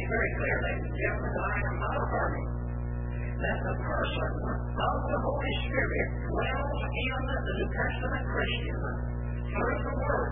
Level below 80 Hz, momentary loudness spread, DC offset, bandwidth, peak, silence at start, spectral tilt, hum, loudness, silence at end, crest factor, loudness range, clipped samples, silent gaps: -36 dBFS; 5 LU; 0.3%; 3.8 kHz; -14 dBFS; 0 s; -10.5 dB/octave; 60 Hz at -35 dBFS; -31 LUFS; 0 s; 16 dB; 1 LU; under 0.1%; none